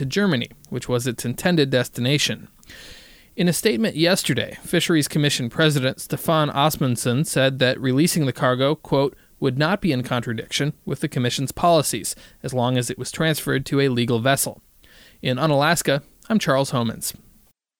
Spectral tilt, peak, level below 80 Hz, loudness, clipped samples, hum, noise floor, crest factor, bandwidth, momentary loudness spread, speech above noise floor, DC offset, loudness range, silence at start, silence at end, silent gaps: -4.5 dB/octave; -4 dBFS; -52 dBFS; -21 LUFS; under 0.1%; none; -57 dBFS; 18 dB; over 20 kHz; 8 LU; 36 dB; under 0.1%; 3 LU; 0 s; 0.7 s; none